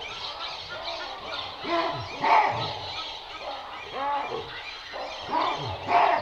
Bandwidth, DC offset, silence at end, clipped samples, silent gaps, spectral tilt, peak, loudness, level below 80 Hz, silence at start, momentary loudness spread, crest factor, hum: 9 kHz; under 0.1%; 0 s; under 0.1%; none; -4 dB/octave; -8 dBFS; -29 LUFS; -58 dBFS; 0 s; 14 LU; 20 dB; none